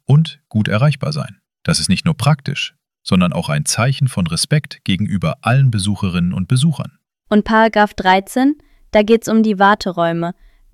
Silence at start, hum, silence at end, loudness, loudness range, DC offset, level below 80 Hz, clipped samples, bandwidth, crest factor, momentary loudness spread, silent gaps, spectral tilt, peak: 0.1 s; none; 0.4 s; -16 LUFS; 3 LU; under 0.1%; -46 dBFS; under 0.1%; 14.5 kHz; 14 dB; 9 LU; none; -5.5 dB/octave; -2 dBFS